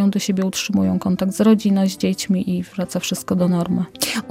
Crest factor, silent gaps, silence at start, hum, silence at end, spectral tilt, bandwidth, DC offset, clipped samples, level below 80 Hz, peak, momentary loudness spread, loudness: 18 dB; none; 0 s; none; 0 s; -5.5 dB/octave; 16 kHz; under 0.1%; under 0.1%; -54 dBFS; 0 dBFS; 8 LU; -19 LUFS